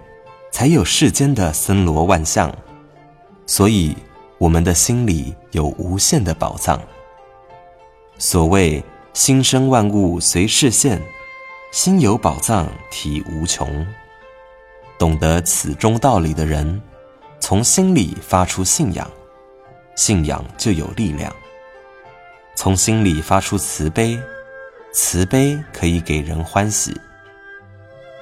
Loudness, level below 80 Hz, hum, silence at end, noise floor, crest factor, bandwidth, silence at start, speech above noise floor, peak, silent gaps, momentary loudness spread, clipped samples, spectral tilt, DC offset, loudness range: -16 LUFS; -32 dBFS; none; 0 s; -45 dBFS; 18 dB; 16 kHz; 0.25 s; 29 dB; 0 dBFS; none; 13 LU; under 0.1%; -4.5 dB/octave; under 0.1%; 5 LU